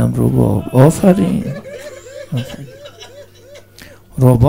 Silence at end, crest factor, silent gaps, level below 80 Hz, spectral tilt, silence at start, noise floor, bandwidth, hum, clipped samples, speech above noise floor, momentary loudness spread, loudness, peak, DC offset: 0 s; 14 dB; none; -36 dBFS; -8 dB/octave; 0 s; -40 dBFS; 16.5 kHz; none; 0.4%; 29 dB; 24 LU; -14 LUFS; 0 dBFS; 0.2%